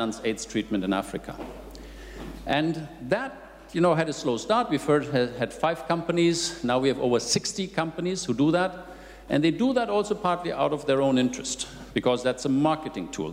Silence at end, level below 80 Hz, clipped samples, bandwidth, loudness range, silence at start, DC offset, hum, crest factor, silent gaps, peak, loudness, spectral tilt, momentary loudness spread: 0 s; -50 dBFS; under 0.1%; 16 kHz; 4 LU; 0 s; under 0.1%; none; 16 dB; none; -10 dBFS; -26 LUFS; -4.5 dB/octave; 15 LU